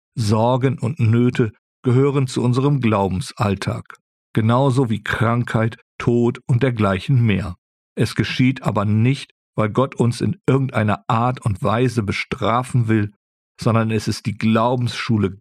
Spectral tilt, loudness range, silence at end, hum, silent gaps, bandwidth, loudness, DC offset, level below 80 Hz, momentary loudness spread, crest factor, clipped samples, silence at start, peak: -7 dB/octave; 2 LU; 0.05 s; none; 1.59-1.83 s, 4.01-4.34 s, 5.82-5.99 s, 7.58-7.96 s, 9.31-9.53 s, 13.16-13.55 s; 12.5 kHz; -19 LUFS; under 0.1%; -50 dBFS; 7 LU; 14 dB; under 0.1%; 0.15 s; -4 dBFS